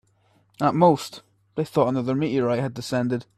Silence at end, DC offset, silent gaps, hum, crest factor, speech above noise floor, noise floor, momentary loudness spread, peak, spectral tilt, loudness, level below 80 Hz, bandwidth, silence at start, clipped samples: 0.15 s; under 0.1%; none; none; 18 dB; 40 dB; -63 dBFS; 10 LU; -4 dBFS; -7 dB/octave; -23 LUFS; -60 dBFS; 14.5 kHz; 0.6 s; under 0.1%